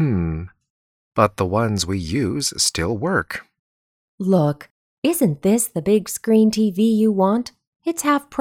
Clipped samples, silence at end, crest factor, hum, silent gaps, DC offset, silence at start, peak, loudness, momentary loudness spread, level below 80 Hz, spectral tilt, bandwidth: under 0.1%; 0 s; 20 dB; none; 0.70-1.11 s, 3.59-4.18 s, 4.70-5.02 s, 7.67-7.73 s; under 0.1%; 0 s; 0 dBFS; -20 LUFS; 11 LU; -46 dBFS; -5 dB/octave; 16.5 kHz